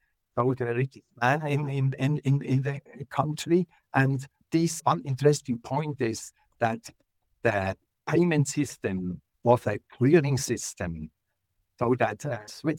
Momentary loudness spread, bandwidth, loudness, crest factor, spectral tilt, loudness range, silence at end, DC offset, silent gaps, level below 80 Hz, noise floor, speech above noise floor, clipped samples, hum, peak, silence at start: 10 LU; 16.5 kHz; -27 LUFS; 20 dB; -6 dB/octave; 3 LU; 0 s; under 0.1%; none; -62 dBFS; -77 dBFS; 51 dB; under 0.1%; none; -8 dBFS; 0.35 s